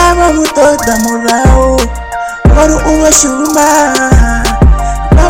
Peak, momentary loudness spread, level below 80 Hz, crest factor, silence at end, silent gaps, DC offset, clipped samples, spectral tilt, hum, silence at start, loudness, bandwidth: 0 dBFS; 6 LU; -12 dBFS; 8 dB; 0 s; none; 0.8%; 1%; -4.5 dB/octave; none; 0 s; -8 LUFS; over 20 kHz